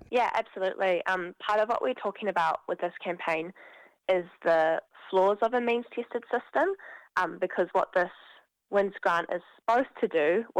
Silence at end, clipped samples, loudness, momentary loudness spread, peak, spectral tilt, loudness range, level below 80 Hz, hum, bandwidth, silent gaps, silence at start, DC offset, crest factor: 0 s; under 0.1%; -29 LUFS; 8 LU; -12 dBFS; -5.5 dB/octave; 2 LU; -72 dBFS; none; 11 kHz; none; 0.1 s; under 0.1%; 16 dB